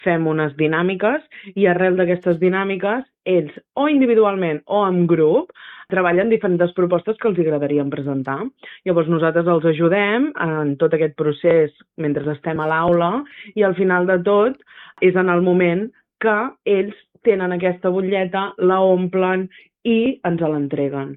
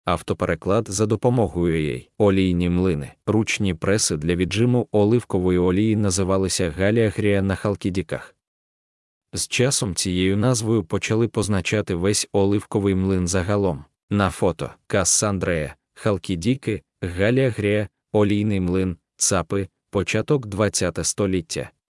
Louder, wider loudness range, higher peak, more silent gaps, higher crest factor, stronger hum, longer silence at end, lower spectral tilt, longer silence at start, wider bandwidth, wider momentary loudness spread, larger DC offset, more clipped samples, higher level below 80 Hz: first, -18 LUFS vs -21 LUFS; about the same, 2 LU vs 3 LU; about the same, -2 dBFS vs -4 dBFS; second, none vs 8.47-9.21 s, 14.03-14.08 s; about the same, 16 dB vs 18 dB; neither; second, 0 s vs 0.25 s; first, -10.5 dB/octave vs -5 dB/octave; about the same, 0.05 s vs 0.05 s; second, 4 kHz vs 12 kHz; about the same, 8 LU vs 7 LU; neither; neither; second, -60 dBFS vs -50 dBFS